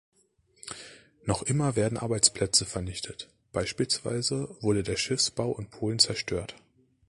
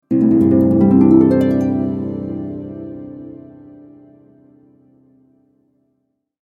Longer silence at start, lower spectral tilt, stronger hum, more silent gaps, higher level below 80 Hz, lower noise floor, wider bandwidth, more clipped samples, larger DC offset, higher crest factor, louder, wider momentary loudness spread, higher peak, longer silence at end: first, 0.65 s vs 0.1 s; second, -3.5 dB/octave vs -11 dB/octave; neither; neither; about the same, -52 dBFS vs -48 dBFS; about the same, -67 dBFS vs -69 dBFS; first, 11.5 kHz vs 4.5 kHz; neither; neither; first, 24 dB vs 16 dB; second, -27 LUFS vs -14 LUFS; second, 18 LU vs 22 LU; second, -6 dBFS vs 0 dBFS; second, 0.5 s vs 3.1 s